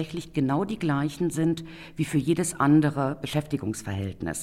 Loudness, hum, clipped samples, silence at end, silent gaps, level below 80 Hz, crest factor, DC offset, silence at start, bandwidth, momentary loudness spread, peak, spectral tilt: -26 LUFS; none; under 0.1%; 0 s; none; -54 dBFS; 16 dB; under 0.1%; 0 s; 15.5 kHz; 11 LU; -10 dBFS; -6 dB/octave